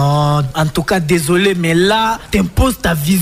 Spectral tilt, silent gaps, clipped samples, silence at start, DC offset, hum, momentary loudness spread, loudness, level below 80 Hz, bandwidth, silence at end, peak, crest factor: -5.5 dB/octave; none; under 0.1%; 0 s; under 0.1%; none; 4 LU; -14 LUFS; -28 dBFS; 16 kHz; 0 s; -2 dBFS; 12 dB